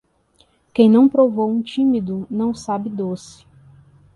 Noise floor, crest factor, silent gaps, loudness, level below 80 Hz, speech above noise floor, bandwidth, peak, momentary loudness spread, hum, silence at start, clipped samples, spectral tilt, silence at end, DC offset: -59 dBFS; 16 dB; none; -18 LUFS; -56 dBFS; 42 dB; 11 kHz; -2 dBFS; 14 LU; none; 0.75 s; under 0.1%; -7.5 dB/octave; 0.9 s; under 0.1%